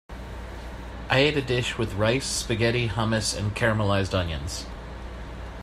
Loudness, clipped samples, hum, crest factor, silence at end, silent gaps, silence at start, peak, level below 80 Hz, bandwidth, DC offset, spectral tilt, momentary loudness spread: -25 LUFS; under 0.1%; none; 20 dB; 0 s; none; 0.1 s; -6 dBFS; -40 dBFS; 14.5 kHz; under 0.1%; -4.5 dB/octave; 17 LU